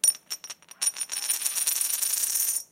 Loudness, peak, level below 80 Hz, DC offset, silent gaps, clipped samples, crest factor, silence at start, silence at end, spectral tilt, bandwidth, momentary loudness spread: -25 LUFS; -6 dBFS; -86 dBFS; under 0.1%; none; under 0.1%; 22 dB; 0.05 s; 0.05 s; 4 dB/octave; 17 kHz; 12 LU